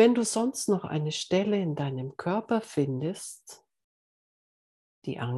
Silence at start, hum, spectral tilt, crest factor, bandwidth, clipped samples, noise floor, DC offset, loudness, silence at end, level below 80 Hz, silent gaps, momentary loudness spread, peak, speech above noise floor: 0 s; none; -5.5 dB/octave; 20 dB; 12.5 kHz; under 0.1%; under -90 dBFS; under 0.1%; -29 LUFS; 0 s; -72 dBFS; 3.84-5.02 s; 13 LU; -8 dBFS; over 62 dB